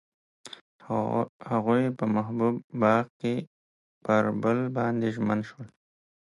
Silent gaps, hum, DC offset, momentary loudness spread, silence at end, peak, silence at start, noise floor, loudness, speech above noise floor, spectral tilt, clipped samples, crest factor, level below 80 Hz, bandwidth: 0.61-0.79 s, 1.29-1.40 s, 2.64-2.70 s, 3.10-3.20 s, 3.47-4.01 s; none; under 0.1%; 21 LU; 0.55 s; -10 dBFS; 0.45 s; under -90 dBFS; -27 LUFS; over 63 dB; -8 dB/octave; under 0.1%; 18 dB; -68 dBFS; 11 kHz